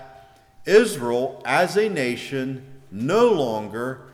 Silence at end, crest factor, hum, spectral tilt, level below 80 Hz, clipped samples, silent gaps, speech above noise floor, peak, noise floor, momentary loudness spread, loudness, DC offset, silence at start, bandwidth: 0.05 s; 16 dB; none; -5 dB/octave; -62 dBFS; under 0.1%; none; 28 dB; -6 dBFS; -49 dBFS; 13 LU; -22 LUFS; under 0.1%; 0 s; 15.5 kHz